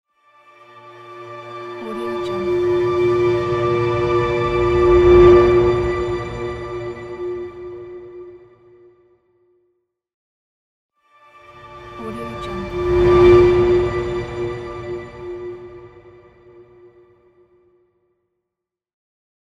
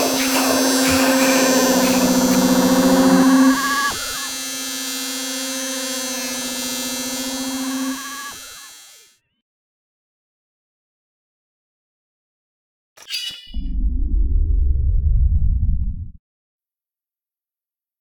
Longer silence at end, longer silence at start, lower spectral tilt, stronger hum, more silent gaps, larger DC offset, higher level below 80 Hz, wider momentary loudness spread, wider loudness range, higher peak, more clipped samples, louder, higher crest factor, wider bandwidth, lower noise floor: first, 3.55 s vs 1.9 s; first, 0.85 s vs 0 s; first, -8 dB/octave vs -3.5 dB/octave; neither; second, 10.14-10.89 s vs 9.42-12.96 s; neither; second, -36 dBFS vs -26 dBFS; first, 24 LU vs 14 LU; first, 20 LU vs 17 LU; about the same, 0 dBFS vs -2 dBFS; neither; about the same, -17 LUFS vs -18 LUFS; about the same, 18 dB vs 18 dB; second, 7.4 kHz vs 17.5 kHz; second, -83 dBFS vs under -90 dBFS